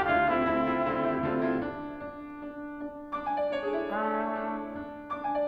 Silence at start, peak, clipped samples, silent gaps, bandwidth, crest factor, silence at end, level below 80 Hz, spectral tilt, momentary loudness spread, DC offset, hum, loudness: 0 s; -14 dBFS; under 0.1%; none; 6 kHz; 16 dB; 0 s; -56 dBFS; -8 dB/octave; 14 LU; under 0.1%; none; -31 LUFS